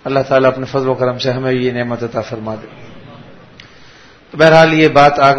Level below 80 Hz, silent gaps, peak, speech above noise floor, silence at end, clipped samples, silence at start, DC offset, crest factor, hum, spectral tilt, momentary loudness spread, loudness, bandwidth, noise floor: -46 dBFS; none; 0 dBFS; 29 dB; 0 s; 0.4%; 0.05 s; under 0.1%; 14 dB; none; -6 dB/octave; 16 LU; -12 LUFS; 9.8 kHz; -41 dBFS